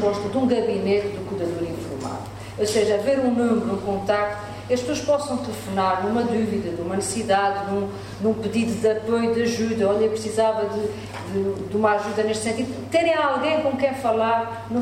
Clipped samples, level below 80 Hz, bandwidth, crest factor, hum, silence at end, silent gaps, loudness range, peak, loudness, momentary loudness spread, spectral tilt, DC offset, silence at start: under 0.1%; -52 dBFS; 16 kHz; 16 dB; none; 0 s; none; 1 LU; -6 dBFS; -23 LUFS; 8 LU; -5 dB/octave; under 0.1%; 0 s